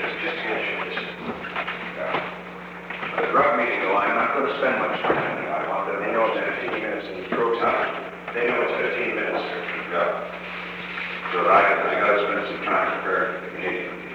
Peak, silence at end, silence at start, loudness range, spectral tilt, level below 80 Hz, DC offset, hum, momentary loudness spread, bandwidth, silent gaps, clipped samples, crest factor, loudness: -6 dBFS; 0 s; 0 s; 4 LU; -6 dB/octave; -60 dBFS; under 0.1%; none; 11 LU; 9.6 kHz; none; under 0.1%; 18 dB; -24 LUFS